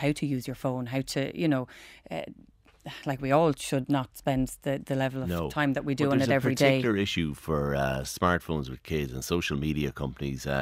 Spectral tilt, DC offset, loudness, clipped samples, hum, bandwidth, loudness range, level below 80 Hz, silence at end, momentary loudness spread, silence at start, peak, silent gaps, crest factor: -5.5 dB/octave; under 0.1%; -29 LUFS; under 0.1%; none; 16 kHz; 4 LU; -48 dBFS; 0 s; 10 LU; 0 s; -8 dBFS; none; 20 dB